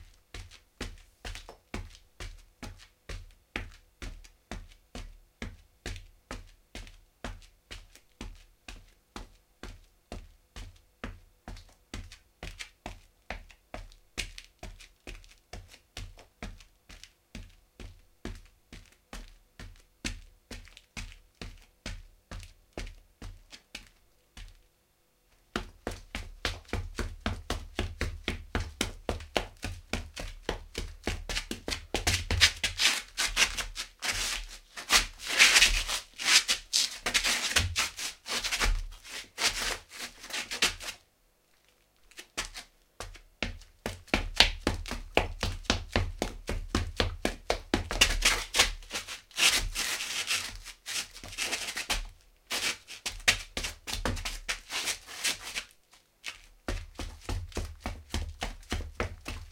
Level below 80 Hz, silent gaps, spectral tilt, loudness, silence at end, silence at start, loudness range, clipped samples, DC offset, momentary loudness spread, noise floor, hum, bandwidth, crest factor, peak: -42 dBFS; none; -1.5 dB/octave; -30 LUFS; 0 s; 0 s; 23 LU; under 0.1%; under 0.1%; 24 LU; -69 dBFS; none; 16.5 kHz; 34 dB; 0 dBFS